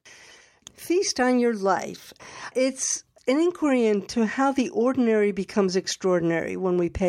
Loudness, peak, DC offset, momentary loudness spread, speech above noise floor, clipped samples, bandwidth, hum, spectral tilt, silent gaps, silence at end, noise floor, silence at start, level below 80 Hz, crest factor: -24 LUFS; -8 dBFS; under 0.1%; 6 LU; 28 dB; under 0.1%; 16 kHz; none; -4.5 dB/octave; none; 0 s; -52 dBFS; 0.05 s; -52 dBFS; 16 dB